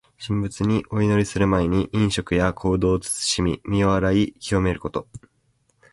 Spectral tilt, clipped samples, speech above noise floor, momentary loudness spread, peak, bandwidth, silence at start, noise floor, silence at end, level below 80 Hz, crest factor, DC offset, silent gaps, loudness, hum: -5.5 dB/octave; under 0.1%; 45 dB; 7 LU; -4 dBFS; 11.5 kHz; 0.2 s; -66 dBFS; 0.75 s; -38 dBFS; 18 dB; under 0.1%; none; -22 LUFS; none